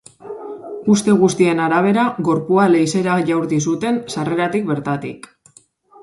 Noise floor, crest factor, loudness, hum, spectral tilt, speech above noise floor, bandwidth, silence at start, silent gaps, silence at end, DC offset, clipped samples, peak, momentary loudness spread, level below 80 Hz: -51 dBFS; 16 dB; -17 LUFS; none; -6 dB/octave; 35 dB; 11.5 kHz; 0.25 s; none; 0.85 s; under 0.1%; under 0.1%; -2 dBFS; 17 LU; -60 dBFS